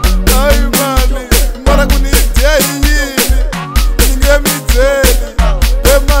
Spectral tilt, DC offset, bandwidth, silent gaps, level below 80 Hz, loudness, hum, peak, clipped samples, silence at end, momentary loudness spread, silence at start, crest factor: -4 dB/octave; 0.9%; 16.5 kHz; none; -10 dBFS; -11 LUFS; none; 0 dBFS; 0.3%; 0 s; 4 LU; 0 s; 8 dB